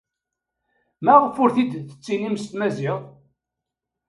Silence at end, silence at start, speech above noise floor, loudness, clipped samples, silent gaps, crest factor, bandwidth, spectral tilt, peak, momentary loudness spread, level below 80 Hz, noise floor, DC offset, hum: 1 s; 1 s; 64 dB; -21 LUFS; under 0.1%; none; 22 dB; 11.5 kHz; -7 dB/octave; 0 dBFS; 13 LU; -68 dBFS; -84 dBFS; under 0.1%; none